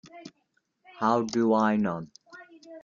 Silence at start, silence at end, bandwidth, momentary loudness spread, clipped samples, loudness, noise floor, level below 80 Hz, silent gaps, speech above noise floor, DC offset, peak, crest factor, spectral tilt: 0.05 s; 0.05 s; 7.4 kHz; 24 LU; under 0.1%; -26 LUFS; -74 dBFS; -70 dBFS; none; 49 dB; under 0.1%; -10 dBFS; 20 dB; -6.5 dB/octave